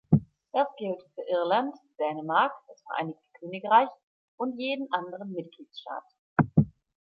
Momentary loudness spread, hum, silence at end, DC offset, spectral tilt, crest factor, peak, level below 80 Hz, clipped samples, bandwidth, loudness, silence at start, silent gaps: 16 LU; none; 0.3 s; under 0.1%; -9.5 dB/octave; 22 dB; -8 dBFS; -58 dBFS; under 0.1%; 6 kHz; -29 LUFS; 0.1 s; 4.03-4.38 s, 6.19-6.36 s